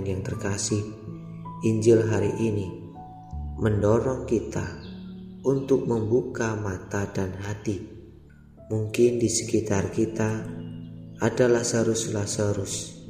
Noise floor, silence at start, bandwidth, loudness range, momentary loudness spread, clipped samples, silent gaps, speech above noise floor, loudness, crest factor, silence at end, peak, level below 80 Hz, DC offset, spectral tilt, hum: -49 dBFS; 0 s; 15.5 kHz; 3 LU; 18 LU; under 0.1%; none; 25 dB; -26 LUFS; 18 dB; 0 s; -8 dBFS; -48 dBFS; under 0.1%; -5.5 dB/octave; none